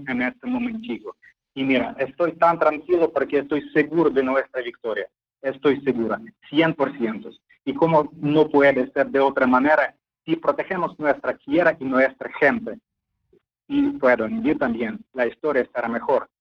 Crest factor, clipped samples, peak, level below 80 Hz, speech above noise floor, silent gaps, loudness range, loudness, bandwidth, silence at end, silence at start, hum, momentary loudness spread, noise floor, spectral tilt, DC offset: 18 dB; under 0.1%; -4 dBFS; -60 dBFS; 43 dB; none; 4 LU; -22 LUFS; 6.4 kHz; 0.15 s; 0 s; none; 12 LU; -64 dBFS; -8 dB/octave; under 0.1%